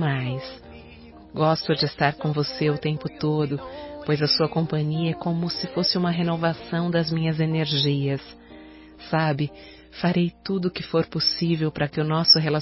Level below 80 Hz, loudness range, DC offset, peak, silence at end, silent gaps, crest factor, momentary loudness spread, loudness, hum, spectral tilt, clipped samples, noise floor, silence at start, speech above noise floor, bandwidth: -54 dBFS; 2 LU; under 0.1%; -4 dBFS; 0 s; none; 20 dB; 10 LU; -23 LUFS; none; -8.5 dB/octave; under 0.1%; -45 dBFS; 0 s; 22 dB; 6 kHz